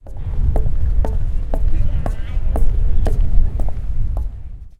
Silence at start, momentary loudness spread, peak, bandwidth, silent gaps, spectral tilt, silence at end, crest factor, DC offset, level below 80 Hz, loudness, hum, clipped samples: 0.05 s; 5 LU; 0 dBFS; 3.1 kHz; none; -8.5 dB/octave; 0.1 s; 14 dB; under 0.1%; -16 dBFS; -23 LUFS; none; under 0.1%